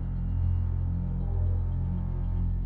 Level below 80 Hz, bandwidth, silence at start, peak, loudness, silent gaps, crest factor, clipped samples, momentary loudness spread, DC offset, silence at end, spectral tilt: -32 dBFS; 2.3 kHz; 0 s; -18 dBFS; -30 LUFS; none; 10 dB; under 0.1%; 3 LU; under 0.1%; 0 s; -12 dB/octave